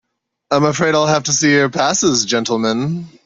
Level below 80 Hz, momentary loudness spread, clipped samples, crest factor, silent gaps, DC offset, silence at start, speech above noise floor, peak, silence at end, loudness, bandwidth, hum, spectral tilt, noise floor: -54 dBFS; 6 LU; under 0.1%; 14 dB; none; under 0.1%; 0.5 s; 25 dB; -2 dBFS; 0.15 s; -15 LUFS; 7.8 kHz; none; -3.5 dB/octave; -40 dBFS